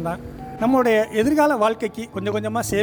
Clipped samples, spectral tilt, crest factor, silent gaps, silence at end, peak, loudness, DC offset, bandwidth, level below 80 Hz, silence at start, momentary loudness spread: under 0.1%; -5.5 dB/octave; 14 dB; none; 0 s; -6 dBFS; -20 LUFS; under 0.1%; over 20 kHz; -48 dBFS; 0 s; 11 LU